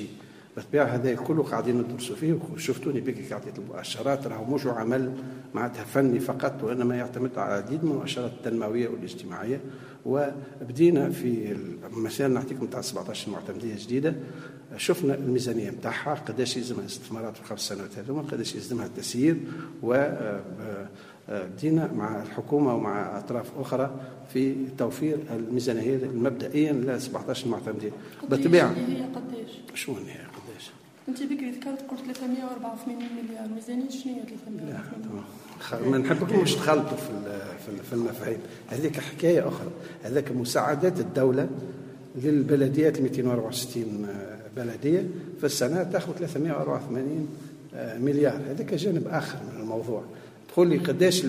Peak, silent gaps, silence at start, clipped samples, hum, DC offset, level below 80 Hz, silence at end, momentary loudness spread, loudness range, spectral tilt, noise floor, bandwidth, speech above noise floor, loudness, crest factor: -6 dBFS; none; 0 s; under 0.1%; none; under 0.1%; -68 dBFS; 0 s; 14 LU; 6 LU; -6 dB/octave; -48 dBFS; 15.5 kHz; 20 dB; -28 LUFS; 22 dB